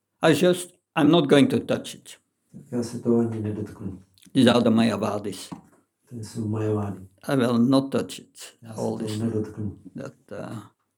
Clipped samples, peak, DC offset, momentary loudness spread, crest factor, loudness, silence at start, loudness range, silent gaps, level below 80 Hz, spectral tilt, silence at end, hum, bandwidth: under 0.1%; -2 dBFS; under 0.1%; 20 LU; 22 dB; -23 LUFS; 0.2 s; 3 LU; none; -68 dBFS; -6 dB/octave; 0.35 s; none; 18.5 kHz